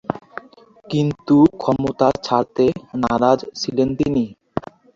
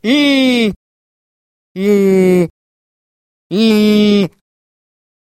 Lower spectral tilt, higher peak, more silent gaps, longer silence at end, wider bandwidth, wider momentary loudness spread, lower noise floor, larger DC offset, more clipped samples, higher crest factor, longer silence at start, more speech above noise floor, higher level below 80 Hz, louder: about the same, -7 dB/octave vs -6 dB/octave; about the same, -2 dBFS vs 0 dBFS; second, none vs 0.76-1.75 s, 2.50-3.50 s; second, 0.35 s vs 1.1 s; second, 7.6 kHz vs 14.5 kHz; first, 15 LU vs 11 LU; second, -47 dBFS vs under -90 dBFS; neither; neither; about the same, 18 dB vs 14 dB; about the same, 0.1 s vs 0.05 s; second, 29 dB vs over 79 dB; about the same, -48 dBFS vs -52 dBFS; second, -19 LUFS vs -12 LUFS